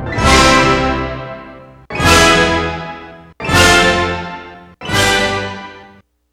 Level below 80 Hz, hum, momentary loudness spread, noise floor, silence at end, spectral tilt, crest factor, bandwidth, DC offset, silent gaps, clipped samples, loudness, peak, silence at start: -28 dBFS; none; 21 LU; -44 dBFS; 0.5 s; -3.5 dB/octave; 14 dB; over 20 kHz; under 0.1%; none; under 0.1%; -11 LUFS; 0 dBFS; 0 s